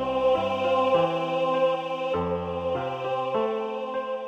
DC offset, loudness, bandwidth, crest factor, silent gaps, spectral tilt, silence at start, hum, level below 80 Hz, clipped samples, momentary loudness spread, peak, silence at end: under 0.1%; -26 LUFS; 7.8 kHz; 14 dB; none; -6.5 dB/octave; 0 s; none; -56 dBFS; under 0.1%; 7 LU; -12 dBFS; 0 s